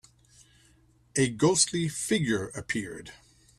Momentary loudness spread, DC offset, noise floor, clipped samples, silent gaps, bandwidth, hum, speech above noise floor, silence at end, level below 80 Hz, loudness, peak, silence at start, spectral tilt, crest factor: 16 LU; under 0.1%; -62 dBFS; under 0.1%; none; 14.5 kHz; none; 34 dB; 0.45 s; -60 dBFS; -27 LUFS; -10 dBFS; 1.15 s; -3.5 dB/octave; 20 dB